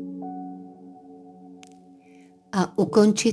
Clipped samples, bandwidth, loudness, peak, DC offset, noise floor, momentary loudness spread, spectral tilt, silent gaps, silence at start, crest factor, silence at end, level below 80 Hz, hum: under 0.1%; 11 kHz; -23 LUFS; -4 dBFS; under 0.1%; -52 dBFS; 28 LU; -5 dB/octave; none; 0 s; 22 dB; 0 s; -68 dBFS; none